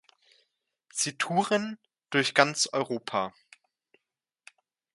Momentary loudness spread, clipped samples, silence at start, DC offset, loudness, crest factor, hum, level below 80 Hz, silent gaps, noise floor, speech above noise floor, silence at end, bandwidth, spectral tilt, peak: 14 LU; under 0.1%; 0.95 s; under 0.1%; -28 LUFS; 28 dB; none; -76 dBFS; none; -86 dBFS; 58 dB; 1.65 s; 11.5 kHz; -2.5 dB/octave; -2 dBFS